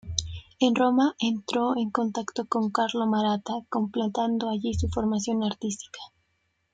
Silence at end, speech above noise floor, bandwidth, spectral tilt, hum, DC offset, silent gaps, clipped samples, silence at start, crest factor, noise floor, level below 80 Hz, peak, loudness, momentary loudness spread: 0.65 s; 48 dB; 9.2 kHz; -5 dB/octave; none; under 0.1%; none; under 0.1%; 0.05 s; 22 dB; -74 dBFS; -50 dBFS; -6 dBFS; -27 LUFS; 10 LU